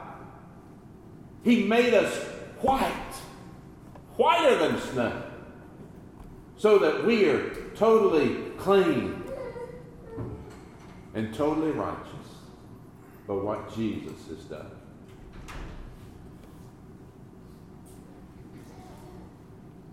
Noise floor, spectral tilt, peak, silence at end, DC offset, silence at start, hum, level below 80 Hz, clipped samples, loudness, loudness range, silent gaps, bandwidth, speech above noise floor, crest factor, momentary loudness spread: -49 dBFS; -5.5 dB/octave; -8 dBFS; 0 s; under 0.1%; 0 s; none; -52 dBFS; under 0.1%; -26 LUFS; 22 LU; none; 15.5 kHz; 24 dB; 20 dB; 27 LU